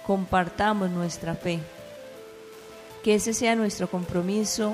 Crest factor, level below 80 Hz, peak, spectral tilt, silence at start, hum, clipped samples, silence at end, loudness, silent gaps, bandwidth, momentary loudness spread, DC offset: 18 dB; -52 dBFS; -10 dBFS; -4.5 dB/octave; 0 s; none; under 0.1%; 0 s; -26 LUFS; none; 15.5 kHz; 21 LU; under 0.1%